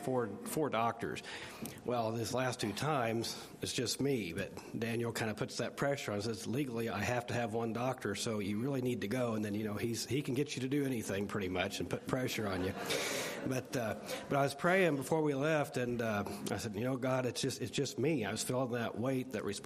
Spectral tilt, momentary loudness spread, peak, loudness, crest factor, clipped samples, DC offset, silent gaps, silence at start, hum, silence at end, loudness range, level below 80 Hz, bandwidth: -5 dB/octave; 5 LU; -14 dBFS; -36 LUFS; 22 dB; under 0.1%; under 0.1%; none; 0 s; none; 0 s; 3 LU; -70 dBFS; 15 kHz